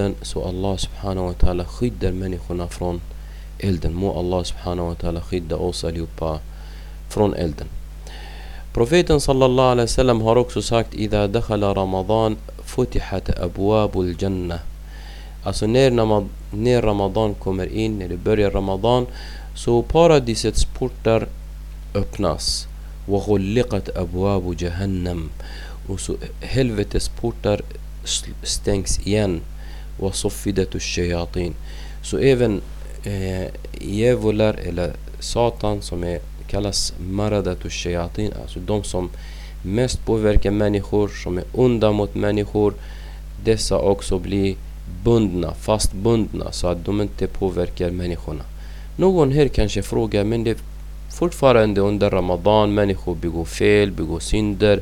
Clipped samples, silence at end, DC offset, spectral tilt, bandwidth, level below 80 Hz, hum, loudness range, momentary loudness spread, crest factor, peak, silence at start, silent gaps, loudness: under 0.1%; 0 s; under 0.1%; -5.5 dB/octave; 17 kHz; -30 dBFS; none; 6 LU; 16 LU; 20 dB; 0 dBFS; 0 s; none; -21 LUFS